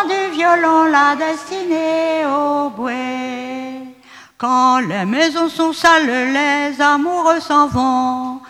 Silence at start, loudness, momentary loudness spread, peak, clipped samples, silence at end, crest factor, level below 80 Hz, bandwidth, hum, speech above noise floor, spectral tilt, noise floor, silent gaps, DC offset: 0 s; -15 LUFS; 11 LU; 0 dBFS; under 0.1%; 0 s; 16 dB; -52 dBFS; 15 kHz; 50 Hz at -50 dBFS; 27 dB; -4 dB/octave; -42 dBFS; none; under 0.1%